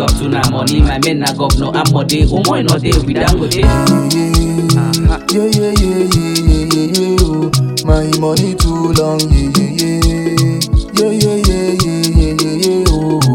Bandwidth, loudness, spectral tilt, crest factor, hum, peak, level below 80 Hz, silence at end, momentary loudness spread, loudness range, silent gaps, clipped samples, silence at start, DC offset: 17 kHz; -12 LUFS; -5.5 dB/octave; 12 dB; none; 0 dBFS; -18 dBFS; 0 s; 2 LU; 1 LU; none; 0.2%; 0 s; under 0.1%